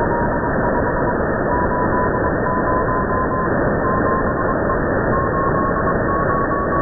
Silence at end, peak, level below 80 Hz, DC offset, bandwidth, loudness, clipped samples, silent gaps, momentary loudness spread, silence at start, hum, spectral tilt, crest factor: 0 s; -8 dBFS; -30 dBFS; under 0.1%; 2 kHz; -18 LUFS; under 0.1%; none; 1 LU; 0 s; none; -16 dB/octave; 10 dB